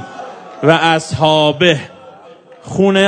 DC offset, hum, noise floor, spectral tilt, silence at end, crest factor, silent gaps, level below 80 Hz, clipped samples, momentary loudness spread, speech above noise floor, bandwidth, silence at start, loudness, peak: under 0.1%; none; -40 dBFS; -5 dB/octave; 0 s; 14 dB; none; -52 dBFS; 0.3%; 20 LU; 28 dB; 11 kHz; 0 s; -13 LUFS; 0 dBFS